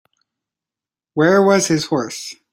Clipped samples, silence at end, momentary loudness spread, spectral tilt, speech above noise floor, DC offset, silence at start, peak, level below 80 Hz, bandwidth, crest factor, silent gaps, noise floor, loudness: under 0.1%; 0.2 s; 15 LU; -4.5 dB/octave; 73 dB; under 0.1%; 1.15 s; -2 dBFS; -62 dBFS; 16.5 kHz; 16 dB; none; -89 dBFS; -16 LUFS